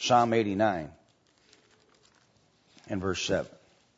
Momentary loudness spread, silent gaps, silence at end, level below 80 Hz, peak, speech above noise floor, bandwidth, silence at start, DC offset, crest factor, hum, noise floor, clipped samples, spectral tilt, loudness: 16 LU; none; 0.5 s; -62 dBFS; -10 dBFS; 39 dB; 8 kHz; 0 s; under 0.1%; 22 dB; none; -66 dBFS; under 0.1%; -4.5 dB/octave; -28 LUFS